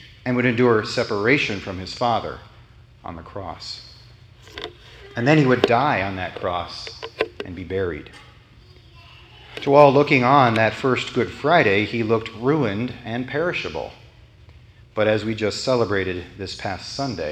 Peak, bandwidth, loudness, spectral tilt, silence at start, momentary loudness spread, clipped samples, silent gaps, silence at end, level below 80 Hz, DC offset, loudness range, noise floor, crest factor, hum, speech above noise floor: 0 dBFS; 10 kHz; -20 LUFS; -6 dB/octave; 0 s; 18 LU; under 0.1%; none; 0 s; -50 dBFS; under 0.1%; 12 LU; -48 dBFS; 22 dB; none; 28 dB